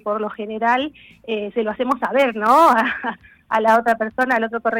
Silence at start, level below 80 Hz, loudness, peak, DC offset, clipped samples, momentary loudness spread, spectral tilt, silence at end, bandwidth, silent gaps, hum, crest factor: 0.05 s; -60 dBFS; -18 LUFS; -2 dBFS; under 0.1%; under 0.1%; 13 LU; -4.5 dB/octave; 0 s; 19 kHz; none; none; 16 dB